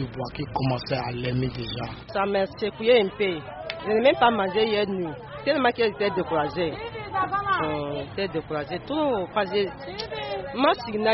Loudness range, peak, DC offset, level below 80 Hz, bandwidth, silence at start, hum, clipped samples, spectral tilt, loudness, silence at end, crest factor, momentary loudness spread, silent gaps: 4 LU; -6 dBFS; under 0.1%; -50 dBFS; 5.8 kHz; 0 s; none; under 0.1%; -3.5 dB/octave; -25 LUFS; 0 s; 18 dB; 11 LU; none